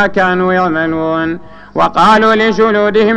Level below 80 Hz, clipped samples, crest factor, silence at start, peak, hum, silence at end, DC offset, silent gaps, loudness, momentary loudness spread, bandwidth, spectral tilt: -42 dBFS; under 0.1%; 10 dB; 0 s; 0 dBFS; none; 0 s; under 0.1%; none; -11 LUFS; 10 LU; 9.8 kHz; -6 dB/octave